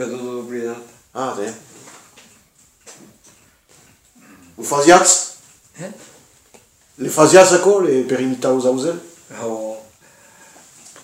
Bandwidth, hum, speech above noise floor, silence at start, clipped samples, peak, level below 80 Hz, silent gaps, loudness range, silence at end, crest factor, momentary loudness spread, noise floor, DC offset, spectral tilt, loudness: 16 kHz; none; 38 dB; 0 s; under 0.1%; 0 dBFS; -60 dBFS; none; 18 LU; 1.2 s; 18 dB; 25 LU; -54 dBFS; under 0.1%; -3 dB/octave; -15 LUFS